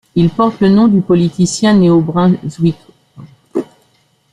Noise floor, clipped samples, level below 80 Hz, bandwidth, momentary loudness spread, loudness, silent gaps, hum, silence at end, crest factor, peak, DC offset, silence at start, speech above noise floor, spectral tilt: -55 dBFS; under 0.1%; -46 dBFS; 11 kHz; 13 LU; -12 LUFS; none; none; 0.7 s; 10 dB; -2 dBFS; under 0.1%; 0.15 s; 45 dB; -7 dB/octave